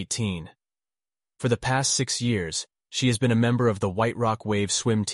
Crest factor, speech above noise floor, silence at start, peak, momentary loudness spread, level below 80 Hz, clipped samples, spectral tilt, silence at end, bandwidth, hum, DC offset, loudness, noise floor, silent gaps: 16 dB; over 66 dB; 0 s; -10 dBFS; 8 LU; -54 dBFS; under 0.1%; -4.5 dB/octave; 0 s; 11.5 kHz; none; under 0.1%; -25 LUFS; under -90 dBFS; none